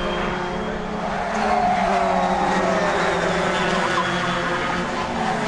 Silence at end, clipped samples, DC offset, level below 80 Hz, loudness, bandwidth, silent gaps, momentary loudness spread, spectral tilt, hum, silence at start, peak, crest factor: 0 s; under 0.1%; under 0.1%; -40 dBFS; -21 LUFS; 11.5 kHz; none; 6 LU; -4.5 dB/octave; none; 0 s; -8 dBFS; 14 dB